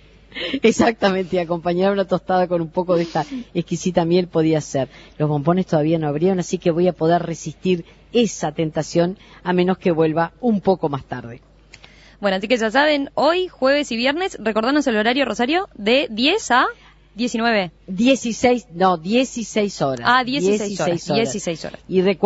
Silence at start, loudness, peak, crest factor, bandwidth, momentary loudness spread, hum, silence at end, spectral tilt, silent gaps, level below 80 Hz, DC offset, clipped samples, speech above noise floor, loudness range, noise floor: 0.35 s; -19 LUFS; 0 dBFS; 20 dB; 8 kHz; 8 LU; none; 0 s; -5 dB/octave; none; -50 dBFS; under 0.1%; under 0.1%; 27 dB; 2 LU; -46 dBFS